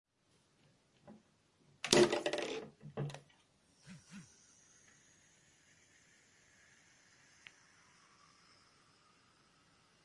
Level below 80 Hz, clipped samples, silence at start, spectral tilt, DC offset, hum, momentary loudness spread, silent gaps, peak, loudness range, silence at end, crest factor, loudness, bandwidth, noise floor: -78 dBFS; under 0.1%; 1.05 s; -3.5 dB/octave; under 0.1%; none; 32 LU; none; -8 dBFS; 24 LU; 5.8 s; 36 dB; -35 LUFS; 11.5 kHz; -75 dBFS